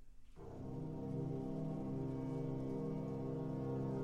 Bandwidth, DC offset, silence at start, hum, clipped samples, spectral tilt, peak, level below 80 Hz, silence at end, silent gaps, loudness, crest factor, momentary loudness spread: 8.4 kHz; under 0.1%; 0 s; none; under 0.1%; -10 dB/octave; -32 dBFS; -60 dBFS; 0 s; none; -44 LUFS; 10 dB; 6 LU